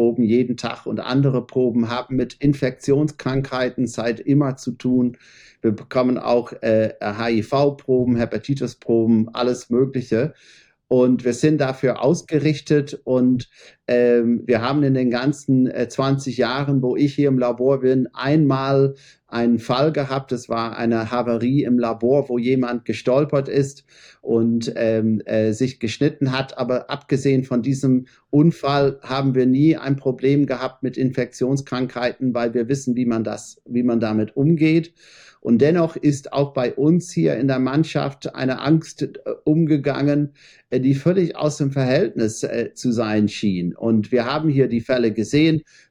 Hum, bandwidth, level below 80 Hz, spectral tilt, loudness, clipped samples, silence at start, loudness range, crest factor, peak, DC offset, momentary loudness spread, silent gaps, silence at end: none; 10.5 kHz; -54 dBFS; -7 dB/octave; -20 LUFS; under 0.1%; 0 s; 2 LU; 16 dB; -4 dBFS; under 0.1%; 7 LU; none; 0.3 s